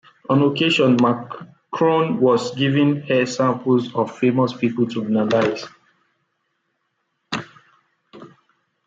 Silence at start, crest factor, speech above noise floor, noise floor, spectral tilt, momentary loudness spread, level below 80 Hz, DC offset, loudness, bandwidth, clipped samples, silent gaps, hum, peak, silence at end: 0.3 s; 16 dB; 54 dB; -72 dBFS; -6.5 dB/octave; 13 LU; -66 dBFS; under 0.1%; -19 LUFS; 7.8 kHz; under 0.1%; none; none; -4 dBFS; 0.6 s